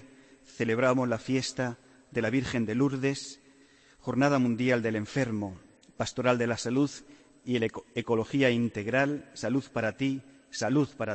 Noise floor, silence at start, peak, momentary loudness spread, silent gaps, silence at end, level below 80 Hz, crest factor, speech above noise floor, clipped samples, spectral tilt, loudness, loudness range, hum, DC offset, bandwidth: -59 dBFS; 0 s; -12 dBFS; 11 LU; none; 0 s; -62 dBFS; 18 dB; 31 dB; under 0.1%; -5.5 dB/octave; -29 LUFS; 2 LU; none; under 0.1%; 8.8 kHz